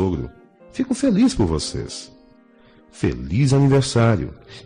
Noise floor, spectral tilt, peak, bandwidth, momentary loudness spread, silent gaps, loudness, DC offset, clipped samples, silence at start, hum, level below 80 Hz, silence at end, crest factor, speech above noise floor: -51 dBFS; -6.5 dB/octave; -8 dBFS; 10.5 kHz; 16 LU; none; -20 LUFS; under 0.1%; under 0.1%; 0 s; none; -40 dBFS; 0.05 s; 12 dB; 32 dB